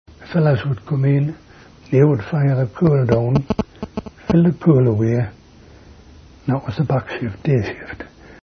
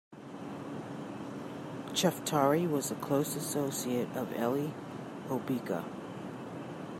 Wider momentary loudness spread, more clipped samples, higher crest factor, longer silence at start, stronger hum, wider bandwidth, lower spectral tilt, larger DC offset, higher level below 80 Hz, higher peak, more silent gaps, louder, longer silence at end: about the same, 15 LU vs 13 LU; neither; about the same, 18 dB vs 20 dB; about the same, 0.2 s vs 0.1 s; neither; second, 6.4 kHz vs 16 kHz; first, -9.5 dB/octave vs -5 dB/octave; neither; first, -44 dBFS vs -74 dBFS; first, 0 dBFS vs -14 dBFS; neither; first, -18 LUFS vs -34 LUFS; about the same, 0.1 s vs 0 s